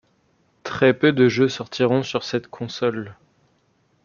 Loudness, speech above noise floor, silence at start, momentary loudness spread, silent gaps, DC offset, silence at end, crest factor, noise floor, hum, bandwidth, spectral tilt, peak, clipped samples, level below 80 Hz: -21 LUFS; 44 dB; 0.65 s; 16 LU; none; under 0.1%; 0.9 s; 20 dB; -64 dBFS; none; 7.2 kHz; -6 dB/octave; -2 dBFS; under 0.1%; -62 dBFS